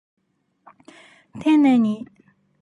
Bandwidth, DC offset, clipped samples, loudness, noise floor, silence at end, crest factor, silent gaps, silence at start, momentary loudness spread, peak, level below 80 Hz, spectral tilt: 10.5 kHz; under 0.1%; under 0.1%; -19 LUFS; -57 dBFS; 0.6 s; 14 dB; none; 1.35 s; 17 LU; -8 dBFS; -68 dBFS; -7 dB/octave